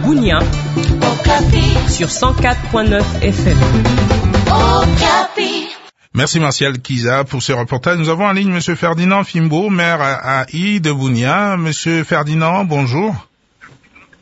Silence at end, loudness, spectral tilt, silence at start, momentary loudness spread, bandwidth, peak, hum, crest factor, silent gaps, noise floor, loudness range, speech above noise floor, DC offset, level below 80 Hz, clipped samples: 0.55 s; -14 LUFS; -5.5 dB/octave; 0 s; 5 LU; 8 kHz; 0 dBFS; none; 14 dB; none; -45 dBFS; 3 LU; 32 dB; under 0.1%; -22 dBFS; under 0.1%